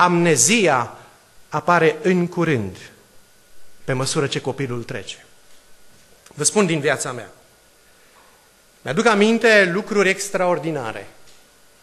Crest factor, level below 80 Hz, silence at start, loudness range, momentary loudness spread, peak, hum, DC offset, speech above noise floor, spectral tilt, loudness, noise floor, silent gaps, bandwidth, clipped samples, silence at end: 18 dB; -60 dBFS; 0 s; 8 LU; 18 LU; -2 dBFS; none; under 0.1%; 35 dB; -4 dB/octave; -18 LUFS; -53 dBFS; none; 13 kHz; under 0.1%; 0.6 s